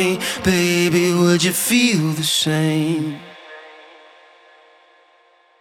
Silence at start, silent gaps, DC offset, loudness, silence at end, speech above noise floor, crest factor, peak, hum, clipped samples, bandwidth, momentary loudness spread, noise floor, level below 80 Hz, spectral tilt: 0 s; none; under 0.1%; -17 LUFS; 1.9 s; 38 dB; 16 dB; -2 dBFS; none; under 0.1%; 18.5 kHz; 21 LU; -55 dBFS; -52 dBFS; -4 dB/octave